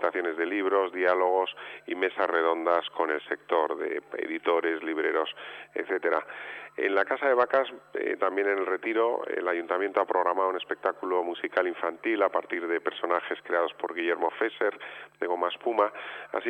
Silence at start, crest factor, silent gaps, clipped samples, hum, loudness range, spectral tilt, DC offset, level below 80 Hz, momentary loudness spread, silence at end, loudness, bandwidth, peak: 0 s; 16 dB; none; under 0.1%; none; 2 LU; -5 dB/octave; under 0.1%; -82 dBFS; 8 LU; 0 s; -28 LUFS; 8.4 kHz; -12 dBFS